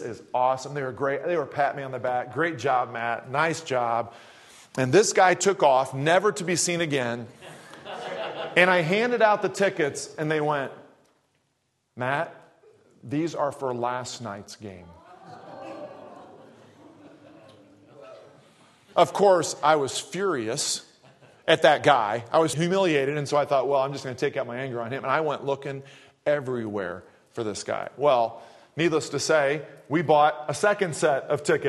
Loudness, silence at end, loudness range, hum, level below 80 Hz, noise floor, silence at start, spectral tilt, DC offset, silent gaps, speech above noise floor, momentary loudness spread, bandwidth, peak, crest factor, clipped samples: -24 LUFS; 0 s; 10 LU; none; -72 dBFS; -73 dBFS; 0 s; -4 dB/octave; under 0.1%; none; 49 dB; 16 LU; 12.5 kHz; -2 dBFS; 24 dB; under 0.1%